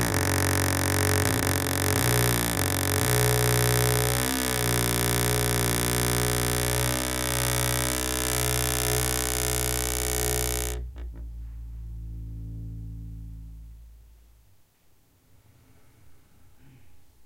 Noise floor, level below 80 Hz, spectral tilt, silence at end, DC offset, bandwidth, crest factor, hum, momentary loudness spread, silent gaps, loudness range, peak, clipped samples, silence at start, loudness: -62 dBFS; -38 dBFS; -3.5 dB/octave; 0 s; under 0.1%; 17 kHz; 22 dB; none; 18 LU; none; 18 LU; -6 dBFS; under 0.1%; 0 s; -24 LUFS